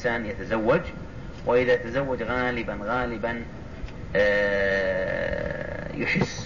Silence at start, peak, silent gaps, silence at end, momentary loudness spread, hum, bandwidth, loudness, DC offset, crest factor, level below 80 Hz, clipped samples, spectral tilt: 0 s; -12 dBFS; none; 0 s; 15 LU; none; 7.4 kHz; -26 LUFS; 0.6%; 14 dB; -42 dBFS; under 0.1%; -6 dB/octave